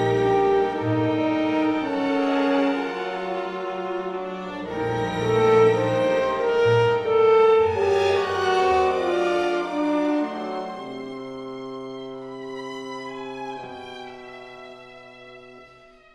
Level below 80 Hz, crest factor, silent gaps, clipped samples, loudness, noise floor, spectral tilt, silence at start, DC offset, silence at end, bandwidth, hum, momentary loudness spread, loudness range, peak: -56 dBFS; 16 dB; none; under 0.1%; -22 LUFS; -50 dBFS; -6.5 dB/octave; 0 s; under 0.1%; 0.5 s; 10 kHz; none; 19 LU; 16 LU; -6 dBFS